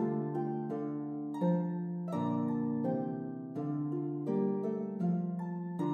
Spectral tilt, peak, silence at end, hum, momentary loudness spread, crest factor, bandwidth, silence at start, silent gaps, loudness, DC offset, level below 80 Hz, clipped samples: -10.5 dB/octave; -22 dBFS; 0 s; none; 6 LU; 12 dB; 4 kHz; 0 s; none; -35 LUFS; under 0.1%; -86 dBFS; under 0.1%